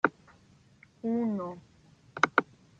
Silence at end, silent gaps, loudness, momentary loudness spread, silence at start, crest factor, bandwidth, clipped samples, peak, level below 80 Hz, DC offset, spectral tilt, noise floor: 0.35 s; none; -31 LUFS; 18 LU; 0.05 s; 28 dB; 7.6 kHz; under 0.1%; -6 dBFS; -72 dBFS; under 0.1%; -5.5 dB/octave; -61 dBFS